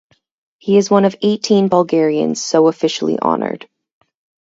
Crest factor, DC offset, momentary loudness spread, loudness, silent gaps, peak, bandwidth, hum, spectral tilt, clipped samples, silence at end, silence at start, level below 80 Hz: 16 dB; under 0.1%; 7 LU; -15 LUFS; none; 0 dBFS; 7.8 kHz; none; -5.5 dB/octave; under 0.1%; 0.75 s; 0.65 s; -64 dBFS